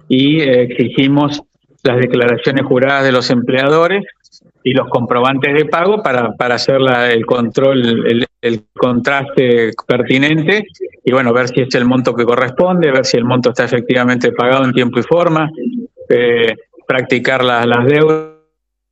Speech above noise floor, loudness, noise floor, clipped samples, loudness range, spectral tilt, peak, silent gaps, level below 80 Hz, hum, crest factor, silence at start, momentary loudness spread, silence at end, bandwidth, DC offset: 53 dB; -12 LUFS; -66 dBFS; under 0.1%; 1 LU; -6 dB/octave; 0 dBFS; none; -52 dBFS; none; 12 dB; 0.1 s; 6 LU; 0.6 s; 8.2 kHz; under 0.1%